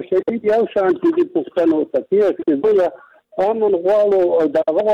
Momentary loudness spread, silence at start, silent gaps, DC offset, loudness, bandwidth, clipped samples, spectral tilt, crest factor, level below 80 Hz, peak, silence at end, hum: 5 LU; 0 s; none; under 0.1%; -17 LUFS; 7.2 kHz; under 0.1%; -7.5 dB/octave; 8 dB; -60 dBFS; -8 dBFS; 0 s; none